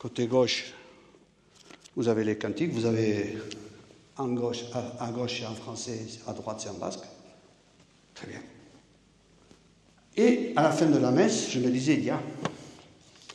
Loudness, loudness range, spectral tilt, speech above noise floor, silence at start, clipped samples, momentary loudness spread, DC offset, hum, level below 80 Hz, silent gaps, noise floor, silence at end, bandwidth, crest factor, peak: -28 LUFS; 15 LU; -5 dB/octave; 33 dB; 0 s; under 0.1%; 20 LU; under 0.1%; none; -68 dBFS; none; -61 dBFS; 0 s; 11.5 kHz; 22 dB; -8 dBFS